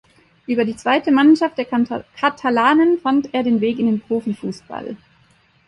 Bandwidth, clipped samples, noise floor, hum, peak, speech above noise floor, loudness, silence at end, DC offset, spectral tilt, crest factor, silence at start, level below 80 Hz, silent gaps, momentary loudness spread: 11 kHz; under 0.1%; -56 dBFS; none; -2 dBFS; 39 dB; -18 LUFS; 0.7 s; under 0.1%; -6 dB/octave; 16 dB; 0.5 s; -60 dBFS; none; 17 LU